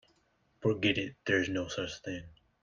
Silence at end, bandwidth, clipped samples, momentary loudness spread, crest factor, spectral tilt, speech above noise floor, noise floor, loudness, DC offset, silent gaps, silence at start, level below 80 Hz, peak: 0.3 s; 7.4 kHz; under 0.1%; 11 LU; 20 dB; -5 dB/octave; 39 dB; -72 dBFS; -33 LUFS; under 0.1%; none; 0.6 s; -64 dBFS; -14 dBFS